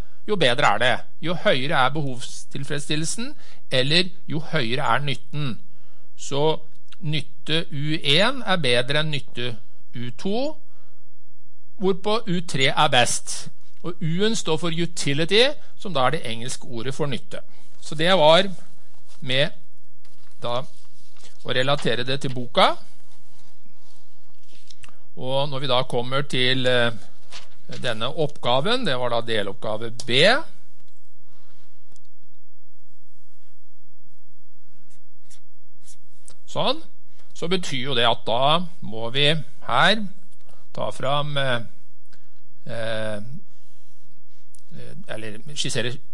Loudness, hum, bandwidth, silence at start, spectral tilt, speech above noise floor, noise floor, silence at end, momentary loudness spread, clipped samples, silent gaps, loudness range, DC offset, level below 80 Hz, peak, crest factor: -23 LUFS; none; 11.5 kHz; 0.25 s; -4 dB/octave; 42 dB; -66 dBFS; 0.15 s; 18 LU; under 0.1%; none; 7 LU; 10%; -64 dBFS; -2 dBFS; 22 dB